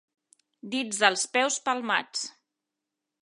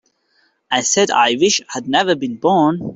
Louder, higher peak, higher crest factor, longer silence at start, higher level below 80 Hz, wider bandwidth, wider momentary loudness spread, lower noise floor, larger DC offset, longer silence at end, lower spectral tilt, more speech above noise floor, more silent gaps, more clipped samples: second, -26 LUFS vs -16 LUFS; about the same, -4 dBFS vs -2 dBFS; first, 26 dB vs 14 dB; about the same, 0.65 s vs 0.7 s; second, -86 dBFS vs -60 dBFS; first, 11.5 kHz vs 8.2 kHz; first, 11 LU vs 5 LU; first, -86 dBFS vs -61 dBFS; neither; first, 0.95 s vs 0 s; second, -1 dB/octave vs -3 dB/octave; first, 59 dB vs 45 dB; neither; neither